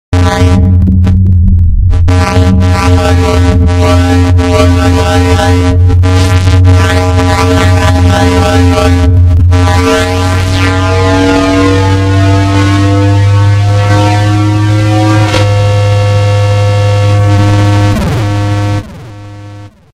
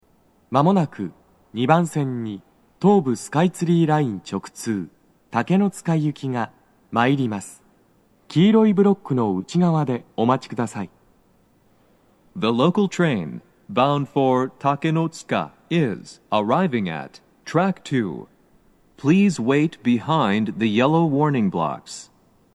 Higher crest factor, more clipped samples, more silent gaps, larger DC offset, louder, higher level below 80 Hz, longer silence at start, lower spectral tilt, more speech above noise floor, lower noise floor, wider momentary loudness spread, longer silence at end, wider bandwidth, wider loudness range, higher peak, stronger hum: second, 6 dB vs 20 dB; first, 0.4% vs under 0.1%; neither; neither; first, -8 LUFS vs -21 LUFS; first, -16 dBFS vs -64 dBFS; second, 0.1 s vs 0.5 s; about the same, -6.5 dB/octave vs -7 dB/octave; second, 23 dB vs 39 dB; second, -28 dBFS vs -59 dBFS; second, 3 LU vs 15 LU; second, 0.25 s vs 0.5 s; about the same, 12 kHz vs 12.5 kHz; second, 1 LU vs 4 LU; about the same, 0 dBFS vs -2 dBFS; neither